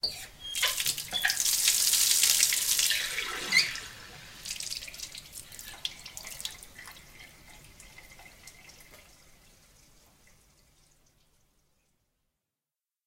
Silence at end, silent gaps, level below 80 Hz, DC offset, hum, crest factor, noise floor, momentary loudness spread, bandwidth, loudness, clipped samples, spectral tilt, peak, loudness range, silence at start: 4.1 s; none; -60 dBFS; under 0.1%; none; 26 dB; under -90 dBFS; 24 LU; 17 kHz; -26 LUFS; under 0.1%; 2 dB/octave; -6 dBFS; 21 LU; 0.05 s